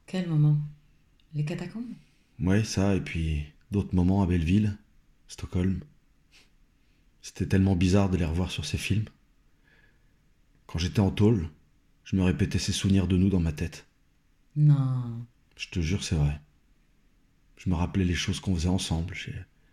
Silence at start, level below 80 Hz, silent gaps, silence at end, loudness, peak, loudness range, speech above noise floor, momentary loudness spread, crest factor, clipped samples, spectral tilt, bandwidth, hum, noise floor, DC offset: 0.1 s; -46 dBFS; none; 0.3 s; -27 LUFS; -12 dBFS; 4 LU; 40 dB; 16 LU; 16 dB; under 0.1%; -6.5 dB/octave; 14 kHz; none; -66 dBFS; under 0.1%